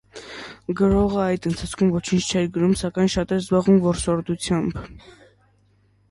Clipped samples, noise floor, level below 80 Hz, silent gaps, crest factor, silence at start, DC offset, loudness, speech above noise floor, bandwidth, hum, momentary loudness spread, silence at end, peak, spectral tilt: under 0.1%; -60 dBFS; -40 dBFS; none; 16 dB; 0.15 s; under 0.1%; -21 LUFS; 39 dB; 11.5 kHz; 50 Hz at -40 dBFS; 17 LU; 1.1 s; -6 dBFS; -6 dB/octave